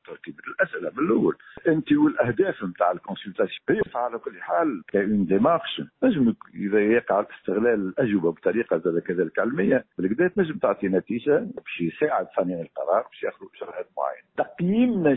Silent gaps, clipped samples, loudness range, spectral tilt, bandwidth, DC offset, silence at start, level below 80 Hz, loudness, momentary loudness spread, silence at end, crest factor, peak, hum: none; under 0.1%; 3 LU; -11.5 dB/octave; 4 kHz; under 0.1%; 0.1 s; -60 dBFS; -24 LUFS; 11 LU; 0 s; 16 dB; -8 dBFS; none